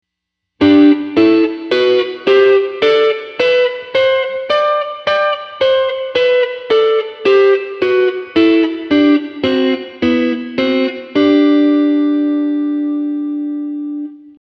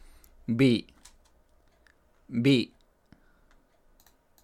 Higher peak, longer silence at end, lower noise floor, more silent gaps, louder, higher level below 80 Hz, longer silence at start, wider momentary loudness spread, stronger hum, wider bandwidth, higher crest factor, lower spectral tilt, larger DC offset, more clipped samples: first, 0 dBFS vs -10 dBFS; second, 0.1 s vs 1.75 s; first, -77 dBFS vs -63 dBFS; neither; first, -13 LUFS vs -26 LUFS; about the same, -56 dBFS vs -60 dBFS; about the same, 0.6 s vs 0.5 s; second, 7 LU vs 14 LU; neither; second, 6.4 kHz vs 13 kHz; second, 14 dB vs 20 dB; about the same, -6 dB/octave vs -6.5 dB/octave; neither; neither